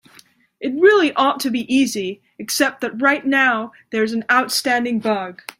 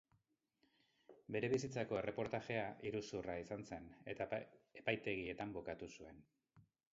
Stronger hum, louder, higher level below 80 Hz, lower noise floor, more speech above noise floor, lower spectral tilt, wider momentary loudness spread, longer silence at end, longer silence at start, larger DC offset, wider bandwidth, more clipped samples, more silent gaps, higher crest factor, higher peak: neither; first, -18 LUFS vs -45 LUFS; first, -66 dBFS vs -72 dBFS; second, -51 dBFS vs -82 dBFS; second, 33 dB vs 38 dB; second, -3 dB/octave vs -4.5 dB/octave; about the same, 12 LU vs 12 LU; about the same, 0.25 s vs 0.3 s; second, 0.6 s vs 1.1 s; neither; first, 16 kHz vs 7.6 kHz; neither; neither; second, 18 dB vs 24 dB; first, -2 dBFS vs -22 dBFS